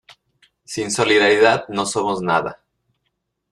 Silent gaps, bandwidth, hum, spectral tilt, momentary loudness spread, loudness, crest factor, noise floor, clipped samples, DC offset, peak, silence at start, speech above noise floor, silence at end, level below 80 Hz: none; 12.5 kHz; none; -3.5 dB/octave; 14 LU; -17 LUFS; 18 dB; -74 dBFS; under 0.1%; under 0.1%; -2 dBFS; 0.7 s; 56 dB; 0.95 s; -58 dBFS